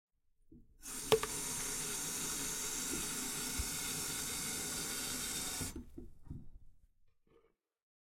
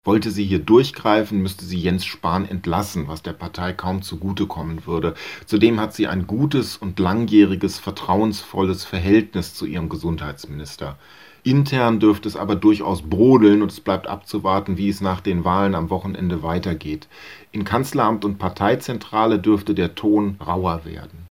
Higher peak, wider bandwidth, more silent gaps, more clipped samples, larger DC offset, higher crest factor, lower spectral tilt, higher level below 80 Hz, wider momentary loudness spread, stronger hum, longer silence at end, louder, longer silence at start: second, -12 dBFS vs 0 dBFS; about the same, 16.5 kHz vs 16 kHz; neither; neither; second, under 0.1% vs 0.2%; first, 28 dB vs 20 dB; second, -1.5 dB/octave vs -7 dB/octave; second, -56 dBFS vs -46 dBFS; first, 18 LU vs 13 LU; neither; first, 0.9 s vs 0.05 s; second, -37 LUFS vs -20 LUFS; first, 0.5 s vs 0.05 s